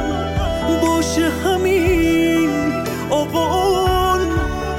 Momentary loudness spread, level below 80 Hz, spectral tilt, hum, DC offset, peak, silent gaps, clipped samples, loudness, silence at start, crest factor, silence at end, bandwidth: 5 LU; -30 dBFS; -5 dB/octave; none; 0.3%; -6 dBFS; none; under 0.1%; -17 LUFS; 0 s; 10 dB; 0 s; 17 kHz